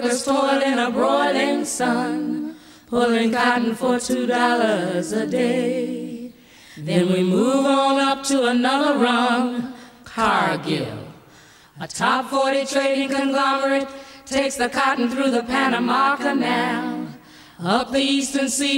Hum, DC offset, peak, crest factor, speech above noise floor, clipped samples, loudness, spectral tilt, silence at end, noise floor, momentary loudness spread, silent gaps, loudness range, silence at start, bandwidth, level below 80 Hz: none; under 0.1%; -4 dBFS; 16 dB; 29 dB; under 0.1%; -20 LUFS; -4 dB/octave; 0 s; -49 dBFS; 12 LU; none; 3 LU; 0 s; 16 kHz; -58 dBFS